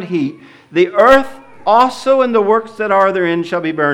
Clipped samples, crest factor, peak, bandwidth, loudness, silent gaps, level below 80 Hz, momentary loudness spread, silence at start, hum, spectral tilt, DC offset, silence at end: under 0.1%; 14 dB; 0 dBFS; 12.5 kHz; -13 LUFS; none; -48 dBFS; 11 LU; 0 s; none; -6 dB/octave; under 0.1%; 0 s